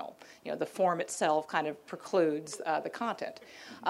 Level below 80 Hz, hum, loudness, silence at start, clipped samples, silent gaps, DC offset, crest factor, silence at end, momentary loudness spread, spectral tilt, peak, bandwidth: -82 dBFS; none; -32 LUFS; 0 s; under 0.1%; none; under 0.1%; 20 dB; 0 s; 16 LU; -4 dB/octave; -14 dBFS; 16 kHz